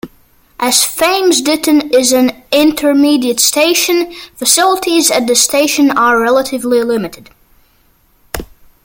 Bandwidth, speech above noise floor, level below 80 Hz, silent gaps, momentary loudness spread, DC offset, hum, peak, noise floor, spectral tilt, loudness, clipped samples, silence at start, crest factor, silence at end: 17.5 kHz; 41 dB; -44 dBFS; none; 9 LU; under 0.1%; none; 0 dBFS; -52 dBFS; -1.5 dB/octave; -11 LUFS; under 0.1%; 0.05 s; 12 dB; 0.4 s